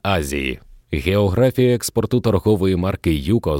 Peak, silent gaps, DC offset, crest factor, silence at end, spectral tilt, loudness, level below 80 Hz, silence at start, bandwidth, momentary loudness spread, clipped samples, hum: -4 dBFS; none; under 0.1%; 14 dB; 0 s; -6 dB/octave; -19 LUFS; -34 dBFS; 0.05 s; 17 kHz; 8 LU; under 0.1%; none